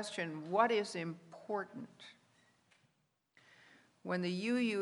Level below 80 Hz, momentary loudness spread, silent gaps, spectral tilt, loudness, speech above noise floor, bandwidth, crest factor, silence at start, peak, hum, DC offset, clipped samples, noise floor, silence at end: -90 dBFS; 20 LU; none; -5 dB/octave; -37 LUFS; 43 dB; 11.5 kHz; 22 dB; 0 s; -16 dBFS; none; under 0.1%; under 0.1%; -80 dBFS; 0 s